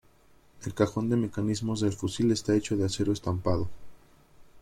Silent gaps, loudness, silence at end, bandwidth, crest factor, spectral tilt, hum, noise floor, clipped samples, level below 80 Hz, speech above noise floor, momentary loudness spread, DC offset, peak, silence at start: none; -29 LUFS; 0 s; 14.5 kHz; 20 dB; -6 dB/octave; none; -59 dBFS; under 0.1%; -54 dBFS; 31 dB; 5 LU; under 0.1%; -10 dBFS; 0.55 s